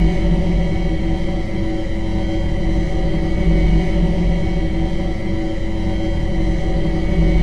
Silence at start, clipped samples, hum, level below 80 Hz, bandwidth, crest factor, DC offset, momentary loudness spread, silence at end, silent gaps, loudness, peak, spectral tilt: 0 s; under 0.1%; none; -20 dBFS; 8 kHz; 12 dB; 6%; 5 LU; 0 s; none; -20 LUFS; -4 dBFS; -8 dB/octave